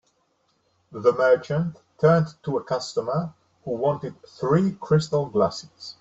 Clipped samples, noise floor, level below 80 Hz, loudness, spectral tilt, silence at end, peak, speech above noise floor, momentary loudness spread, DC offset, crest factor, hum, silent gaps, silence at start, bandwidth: under 0.1%; -68 dBFS; -58 dBFS; -24 LUFS; -7 dB/octave; 0.1 s; -6 dBFS; 45 dB; 16 LU; under 0.1%; 18 dB; none; none; 0.9 s; 8 kHz